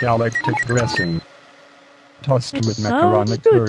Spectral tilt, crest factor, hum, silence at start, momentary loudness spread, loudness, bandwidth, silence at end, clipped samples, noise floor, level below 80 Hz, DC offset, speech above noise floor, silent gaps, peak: -6 dB/octave; 16 dB; none; 0 s; 7 LU; -18 LUFS; 11 kHz; 0 s; under 0.1%; -48 dBFS; -50 dBFS; under 0.1%; 30 dB; none; -2 dBFS